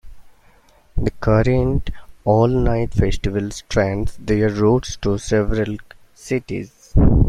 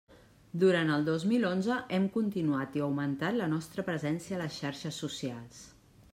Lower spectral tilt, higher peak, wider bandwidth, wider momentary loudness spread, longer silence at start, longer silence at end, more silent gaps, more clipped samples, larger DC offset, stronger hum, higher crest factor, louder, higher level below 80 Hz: about the same, -7 dB/octave vs -6 dB/octave; first, 0 dBFS vs -16 dBFS; second, 11.5 kHz vs 15.5 kHz; about the same, 10 LU vs 10 LU; about the same, 0.05 s vs 0.1 s; second, 0 s vs 0.45 s; neither; neither; neither; neither; about the same, 18 dB vs 16 dB; first, -20 LUFS vs -32 LUFS; first, -26 dBFS vs -68 dBFS